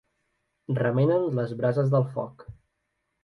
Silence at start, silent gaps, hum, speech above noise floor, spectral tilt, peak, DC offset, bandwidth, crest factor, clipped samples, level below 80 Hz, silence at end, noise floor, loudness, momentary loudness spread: 0.7 s; none; none; 53 dB; -10 dB/octave; -10 dBFS; under 0.1%; 5.6 kHz; 16 dB; under 0.1%; -62 dBFS; 0.7 s; -78 dBFS; -25 LUFS; 10 LU